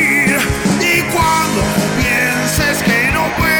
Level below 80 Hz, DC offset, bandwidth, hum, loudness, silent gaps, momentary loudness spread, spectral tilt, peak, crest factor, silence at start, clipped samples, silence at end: -30 dBFS; under 0.1%; over 20 kHz; none; -13 LUFS; none; 3 LU; -4 dB/octave; -2 dBFS; 12 dB; 0 s; under 0.1%; 0 s